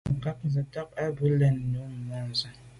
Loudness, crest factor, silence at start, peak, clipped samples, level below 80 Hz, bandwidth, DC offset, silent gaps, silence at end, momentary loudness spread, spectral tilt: -29 LUFS; 14 dB; 0.05 s; -14 dBFS; under 0.1%; -52 dBFS; 11 kHz; under 0.1%; none; 0 s; 11 LU; -7.5 dB/octave